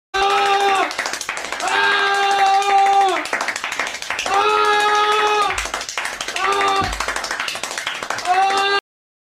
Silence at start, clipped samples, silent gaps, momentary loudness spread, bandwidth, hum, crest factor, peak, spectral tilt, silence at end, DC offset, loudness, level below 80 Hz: 0.15 s; under 0.1%; none; 8 LU; 16 kHz; none; 14 dB; -4 dBFS; -1 dB/octave; 0.6 s; under 0.1%; -18 LUFS; -46 dBFS